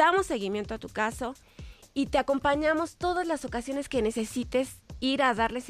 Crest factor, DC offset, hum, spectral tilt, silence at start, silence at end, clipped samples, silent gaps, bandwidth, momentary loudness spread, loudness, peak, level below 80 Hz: 18 dB; under 0.1%; none; -4 dB/octave; 0 s; 0 s; under 0.1%; none; 15 kHz; 11 LU; -29 LUFS; -10 dBFS; -50 dBFS